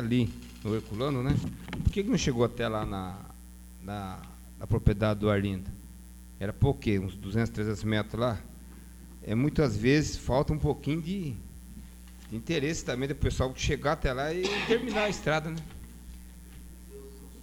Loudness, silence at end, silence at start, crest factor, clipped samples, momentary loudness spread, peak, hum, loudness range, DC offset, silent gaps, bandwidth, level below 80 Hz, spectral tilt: -30 LUFS; 0 s; 0 s; 22 dB; under 0.1%; 21 LU; -8 dBFS; none; 3 LU; under 0.1%; none; 19 kHz; -42 dBFS; -6 dB/octave